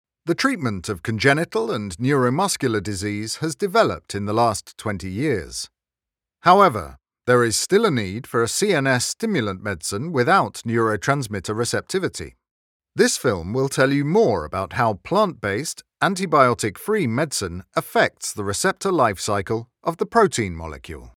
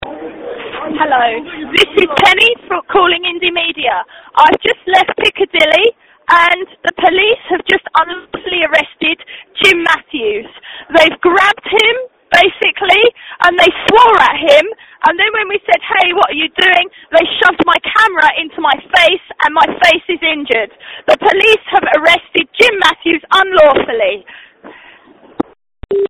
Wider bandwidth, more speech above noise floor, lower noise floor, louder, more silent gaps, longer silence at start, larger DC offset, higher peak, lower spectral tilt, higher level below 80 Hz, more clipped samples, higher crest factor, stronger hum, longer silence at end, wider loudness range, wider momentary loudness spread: about the same, 18 kHz vs 19 kHz; first, 68 dB vs 30 dB; first, -89 dBFS vs -42 dBFS; second, -21 LUFS vs -10 LUFS; first, 12.51-12.80 s vs none; first, 0.25 s vs 0 s; neither; about the same, 0 dBFS vs 0 dBFS; first, -4.5 dB/octave vs -3 dB/octave; about the same, -50 dBFS vs -46 dBFS; second, under 0.1% vs 0.7%; first, 22 dB vs 12 dB; neither; about the same, 0.05 s vs 0 s; about the same, 3 LU vs 3 LU; about the same, 10 LU vs 11 LU